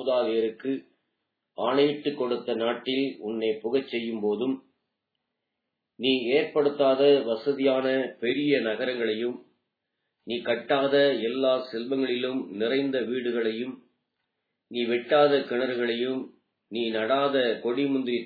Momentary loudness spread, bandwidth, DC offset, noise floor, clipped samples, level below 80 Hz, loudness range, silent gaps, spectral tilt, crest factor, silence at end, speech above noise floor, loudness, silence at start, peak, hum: 11 LU; 4.9 kHz; under 0.1%; -83 dBFS; under 0.1%; -82 dBFS; 5 LU; none; -8 dB/octave; 18 dB; 0 s; 58 dB; -26 LUFS; 0 s; -8 dBFS; none